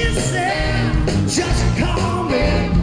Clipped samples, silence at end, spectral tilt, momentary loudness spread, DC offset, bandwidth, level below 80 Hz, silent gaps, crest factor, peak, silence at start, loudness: under 0.1%; 0 s; -5 dB/octave; 1 LU; under 0.1%; 10 kHz; -24 dBFS; none; 12 dB; -4 dBFS; 0 s; -18 LUFS